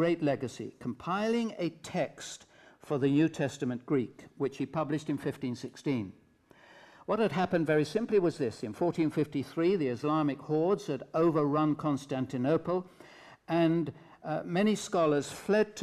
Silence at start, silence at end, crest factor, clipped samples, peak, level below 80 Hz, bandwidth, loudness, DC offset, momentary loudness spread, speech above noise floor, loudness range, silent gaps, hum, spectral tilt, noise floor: 0 s; 0 s; 14 dB; under 0.1%; -16 dBFS; -70 dBFS; 13.5 kHz; -31 LUFS; under 0.1%; 10 LU; 30 dB; 4 LU; none; none; -6.5 dB/octave; -60 dBFS